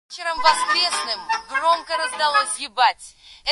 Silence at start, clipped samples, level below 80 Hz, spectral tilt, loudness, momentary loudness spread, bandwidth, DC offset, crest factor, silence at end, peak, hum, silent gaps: 0.1 s; under 0.1%; -60 dBFS; 1.5 dB/octave; -20 LUFS; 7 LU; 11.5 kHz; under 0.1%; 20 dB; 0 s; -2 dBFS; none; none